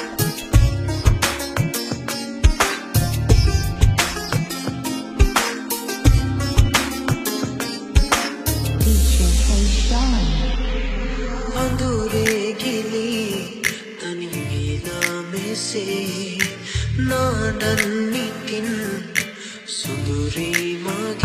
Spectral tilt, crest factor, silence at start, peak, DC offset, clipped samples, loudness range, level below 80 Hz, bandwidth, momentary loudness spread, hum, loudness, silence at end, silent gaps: -4.5 dB/octave; 20 dB; 0 s; 0 dBFS; under 0.1%; under 0.1%; 4 LU; -24 dBFS; 15.5 kHz; 8 LU; none; -21 LUFS; 0 s; none